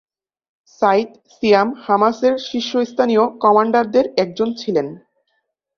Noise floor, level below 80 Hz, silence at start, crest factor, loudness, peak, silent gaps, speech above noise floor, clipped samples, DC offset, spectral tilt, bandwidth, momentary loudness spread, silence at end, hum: -70 dBFS; -62 dBFS; 0.8 s; 16 dB; -17 LUFS; -2 dBFS; none; 54 dB; under 0.1%; under 0.1%; -5.5 dB/octave; 7 kHz; 7 LU; 0.8 s; none